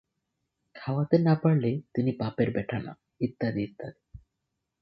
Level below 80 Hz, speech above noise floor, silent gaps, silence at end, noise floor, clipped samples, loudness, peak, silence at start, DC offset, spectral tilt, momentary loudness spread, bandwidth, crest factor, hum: -60 dBFS; 56 dB; none; 0.65 s; -83 dBFS; under 0.1%; -28 LUFS; -10 dBFS; 0.75 s; under 0.1%; -11 dB/octave; 16 LU; 5.8 kHz; 20 dB; none